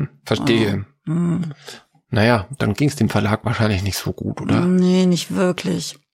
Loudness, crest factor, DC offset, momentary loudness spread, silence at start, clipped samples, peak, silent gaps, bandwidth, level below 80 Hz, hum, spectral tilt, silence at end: -19 LUFS; 18 dB; under 0.1%; 10 LU; 0 s; under 0.1%; -2 dBFS; none; 16.5 kHz; -48 dBFS; none; -6 dB/octave; 0.2 s